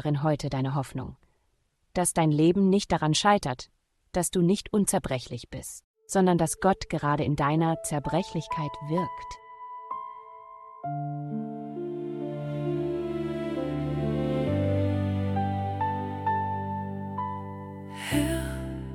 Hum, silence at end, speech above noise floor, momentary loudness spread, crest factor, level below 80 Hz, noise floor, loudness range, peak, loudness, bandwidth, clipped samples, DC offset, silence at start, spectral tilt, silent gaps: none; 0 s; 45 dB; 15 LU; 20 dB; -48 dBFS; -71 dBFS; 9 LU; -8 dBFS; -28 LUFS; 16 kHz; under 0.1%; under 0.1%; 0 s; -5.5 dB/octave; 5.84-5.94 s